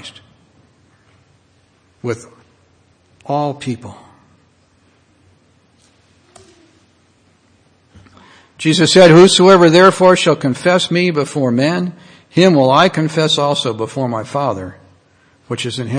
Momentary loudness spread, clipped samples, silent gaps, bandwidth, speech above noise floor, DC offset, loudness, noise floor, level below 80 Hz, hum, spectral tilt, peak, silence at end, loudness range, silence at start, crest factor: 19 LU; 0.3%; none; 10 kHz; 43 dB; under 0.1%; -12 LUFS; -55 dBFS; -54 dBFS; none; -5 dB/octave; 0 dBFS; 0 s; 17 LU; 0.05 s; 16 dB